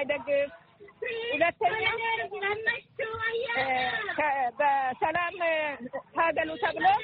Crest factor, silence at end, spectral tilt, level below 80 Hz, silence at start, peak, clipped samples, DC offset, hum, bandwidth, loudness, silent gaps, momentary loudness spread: 16 dB; 0 s; -0.5 dB/octave; -64 dBFS; 0 s; -12 dBFS; under 0.1%; under 0.1%; none; 5 kHz; -28 LUFS; none; 8 LU